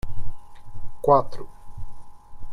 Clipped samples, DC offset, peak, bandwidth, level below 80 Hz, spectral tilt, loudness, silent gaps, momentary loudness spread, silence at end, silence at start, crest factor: under 0.1%; under 0.1%; -4 dBFS; 5.2 kHz; -36 dBFS; -8 dB/octave; -21 LUFS; none; 26 LU; 0 s; 0.05 s; 18 dB